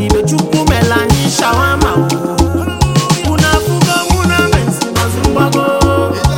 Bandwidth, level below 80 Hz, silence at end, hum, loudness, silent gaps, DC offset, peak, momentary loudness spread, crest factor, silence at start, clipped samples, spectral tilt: 17.5 kHz; -22 dBFS; 0 s; none; -12 LUFS; none; 0.3%; 0 dBFS; 3 LU; 12 dB; 0 s; under 0.1%; -5 dB/octave